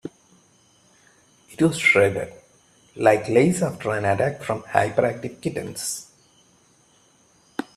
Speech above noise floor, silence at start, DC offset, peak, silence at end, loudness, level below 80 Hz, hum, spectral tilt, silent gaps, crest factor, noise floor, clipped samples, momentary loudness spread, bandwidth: 37 dB; 0.05 s; under 0.1%; 0 dBFS; 0.15 s; -22 LUFS; -60 dBFS; none; -5 dB/octave; none; 24 dB; -58 dBFS; under 0.1%; 16 LU; 14 kHz